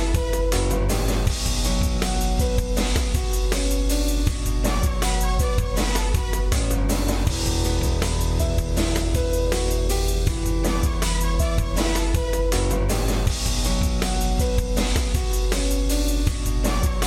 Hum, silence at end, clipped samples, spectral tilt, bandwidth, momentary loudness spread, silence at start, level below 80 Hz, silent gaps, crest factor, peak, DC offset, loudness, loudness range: none; 0 s; under 0.1%; -4.5 dB/octave; 16 kHz; 1 LU; 0 s; -22 dBFS; none; 12 dB; -8 dBFS; 0.1%; -23 LUFS; 0 LU